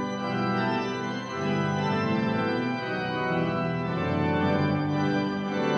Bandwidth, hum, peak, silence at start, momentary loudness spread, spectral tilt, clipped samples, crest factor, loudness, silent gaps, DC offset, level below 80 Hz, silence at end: 8.4 kHz; none; -12 dBFS; 0 s; 4 LU; -7 dB/octave; under 0.1%; 14 dB; -27 LUFS; none; under 0.1%; -60 dBFS; 0 s